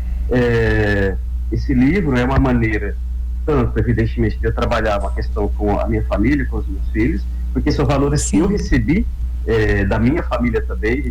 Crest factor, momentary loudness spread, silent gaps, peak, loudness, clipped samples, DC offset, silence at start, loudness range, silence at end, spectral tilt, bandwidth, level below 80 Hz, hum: 14 dB; 7 LU; none; -4 dBFS; -18 LUFS; under 0.1%; under 0.1%; 0 s; 2 LU; 0 s; -6.5 dB/octave; 11.5 kHz; -22 dBFS; none